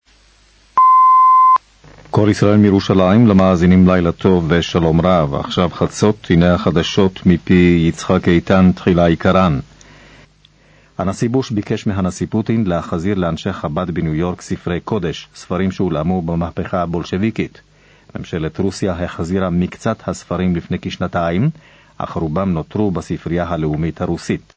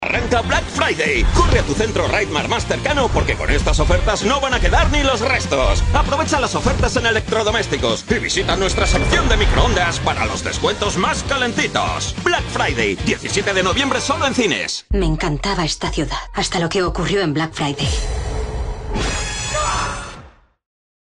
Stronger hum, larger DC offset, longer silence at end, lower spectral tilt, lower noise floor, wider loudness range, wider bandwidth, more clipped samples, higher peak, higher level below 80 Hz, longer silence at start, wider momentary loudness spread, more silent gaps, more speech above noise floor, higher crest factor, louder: neither; neither; second, 0.2 s vs 0.8 s; first, -7 dB/octave vs -4 dB/octave; first, -51 dBFS vs -43 dBFS; first, 9 LU vs 4 LU; second, 8 kHz vs 11.5 kHz; neither; about the same, 0 dBFS vs -2 dBFS; second, -34 dBFS vs -24 dBFS; first, 0.75 s vs 0 s; first, 12 LU vs 6 LU; neither; first, 35 dB vs 25 dB; about the same, 14 dB vs 16 dB; first, -15 LUFS vs -18 LUFS